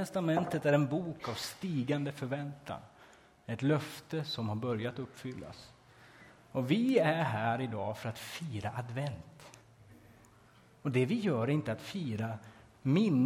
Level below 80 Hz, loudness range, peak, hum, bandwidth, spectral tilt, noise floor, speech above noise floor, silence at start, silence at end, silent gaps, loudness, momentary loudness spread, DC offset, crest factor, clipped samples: -66 dBFS; 4 LU; -16 dBFS; none; 16 kHz; -6.5 dB/octave; -61 dBFS; 28 dB; 0 s; 0 s; none; -34 LUFS; 16 LU; under 0.1%; 18 dB; under 0.1%